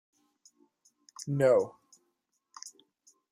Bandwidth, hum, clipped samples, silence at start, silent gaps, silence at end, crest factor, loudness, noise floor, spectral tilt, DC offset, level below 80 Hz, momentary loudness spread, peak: 14.5 kHz; none; under 0.1%; 1.2 s; none; 0.6 s; 20 dB; -28 LUFS; -80 dBFS; -6 dB/octave; under 0.1%; -80 dBFS; 23 LU; -14 dBFS